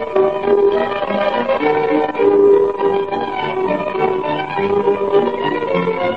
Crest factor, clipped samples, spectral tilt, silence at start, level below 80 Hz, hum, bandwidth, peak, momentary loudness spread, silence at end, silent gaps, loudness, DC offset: 14 dB; under 0.1%; -7.5 dB/octave; 0 s; -52 dBFS; none; 5.4 kHz; -2 dBFS; 7 LU; 0 s; none; -16 LUFS; 0.6%